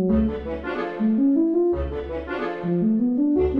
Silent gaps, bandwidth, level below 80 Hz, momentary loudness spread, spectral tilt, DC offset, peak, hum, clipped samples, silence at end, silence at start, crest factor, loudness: none; 5 kHz; -36 dBFS; 9 LU; -10 dB/octave; under 0.1%; -10 dBFS; none; under 0.1%; 0 s; 0 s; 12 dB; -23 LUFS